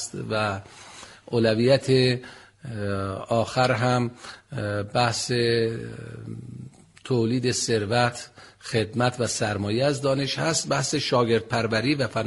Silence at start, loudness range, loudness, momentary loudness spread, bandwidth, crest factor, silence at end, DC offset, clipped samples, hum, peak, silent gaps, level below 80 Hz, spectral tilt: 0 s; 3 LU; -24 LUFS; 18 LU; 11.5 kHz; 18 dB; 0 s; under 0.1%; under 0.1%; none; -6 dBFS; none; -56 dBFS; -4.5 dB/octave